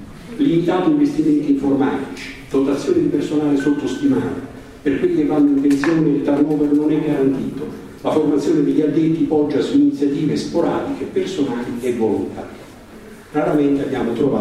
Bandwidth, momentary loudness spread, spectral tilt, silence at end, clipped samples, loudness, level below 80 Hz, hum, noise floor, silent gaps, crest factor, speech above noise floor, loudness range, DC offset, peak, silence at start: 11.5 kHz; 10 LU; -7 dB/octave; 0 s; under 0.1%; -18 LUFS; -48 dBFS; none; -39 dBFS; none; 14 dB; 22 dB; 4 LU; under 0.1%; -4 dBFS; 0 s